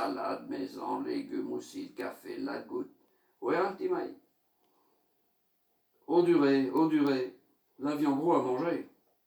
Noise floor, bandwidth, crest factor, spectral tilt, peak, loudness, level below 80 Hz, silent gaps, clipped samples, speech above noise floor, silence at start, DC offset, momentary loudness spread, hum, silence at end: -75 dBFS; over 20 kHz; 18 dB; -6.5 dB/octave; -14 dBFS; -32 LUFS; -84 dBFS; none; under 0.1%; 45 dB; 0 s; under 0.1%; 14 LU; none; 0.4 s